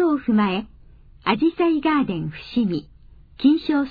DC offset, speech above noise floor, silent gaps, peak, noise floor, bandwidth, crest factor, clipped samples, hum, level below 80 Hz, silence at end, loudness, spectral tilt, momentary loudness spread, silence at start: under 0.1%; 27 dB; none; -6 dBFS; -47 dBFS; 5 kHz; 16 dB; under 0.1%; none; -50 dBFS; 0 s; -21 LUFS; -9 dB/octave; 9 LU; 0 s